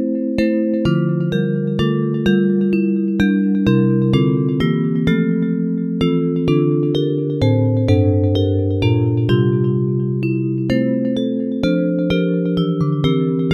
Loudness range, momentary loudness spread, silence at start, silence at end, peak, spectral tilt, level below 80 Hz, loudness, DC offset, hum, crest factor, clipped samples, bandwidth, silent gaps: 2 LU; 4 LU; 0 s; 0 s; -2 dBFS; -9 dB/octave; -42 dBFS; -17 LUFS; under 0.1%; none; 14 dB; under 0.1%; 7 kHz; none